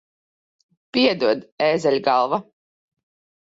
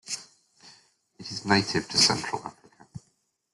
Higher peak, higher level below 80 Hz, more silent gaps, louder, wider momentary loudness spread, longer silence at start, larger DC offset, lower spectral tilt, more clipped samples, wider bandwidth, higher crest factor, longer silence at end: about the same, -6 dBFS vs -6 dBFS; about the same, -66 dBFS vs -62 dBFS; first, 1.52-1.58 s vs none; first, -20 LUFS vs -25 LUFS; second, 6 LU vs 27 LU; first, 0.95 s vs 0.05 s; neither; first, -5 dB/octave vs -2.5 dB/octave; neither; second, 8 kHz vs 12.5 kHz; second, 18 dB vs 24 dB; first, 1 s vs 0.55 s